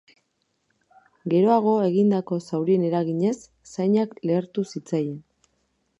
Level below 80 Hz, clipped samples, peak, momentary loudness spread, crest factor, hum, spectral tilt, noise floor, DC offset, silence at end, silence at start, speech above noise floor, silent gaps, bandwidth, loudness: -72 dBFS; under 0.1%; -6 dBFS; 12 LU; 18 dB; none; -8 dB/octave; -73 dBFS; under 0.1%; 0.8 s; 1.25 s; 51 dB; none; 10.5 kHz; -23 LUFS